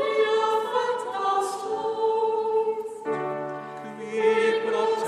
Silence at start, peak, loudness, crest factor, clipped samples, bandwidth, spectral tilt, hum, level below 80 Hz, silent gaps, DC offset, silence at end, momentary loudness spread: 0 s; -10 dBFS; -25 LUFS; 14 dB; under 0.1%; 12.5 kHz; -3.5 dB/octave; none; -80 dBFS; none; under 0.1%; 0 s; 10 LU